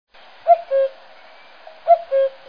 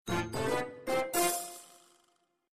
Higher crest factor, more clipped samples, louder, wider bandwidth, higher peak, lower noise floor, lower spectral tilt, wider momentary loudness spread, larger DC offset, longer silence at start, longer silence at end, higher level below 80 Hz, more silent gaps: about the same, 18 dB vs 18 dB; neither; first, -19 LUFS vs -32 LUFS; second, 5.2 kHz vs 15.5 kHz; first, -2 dBFS vs -16 dBFS; second, -46 dBFS vs -74 dBFS; about the same, -3.5 dB/octave vs -3.5 dB/octave; about the same, 10 LU vs 11 LU; first, 0.4% vs under 0.1%; first, 0.45 s vs 0.05 s; first, 0.2 s vs 0.05 s; second, -70 dBFS vs -58 dBFS; neither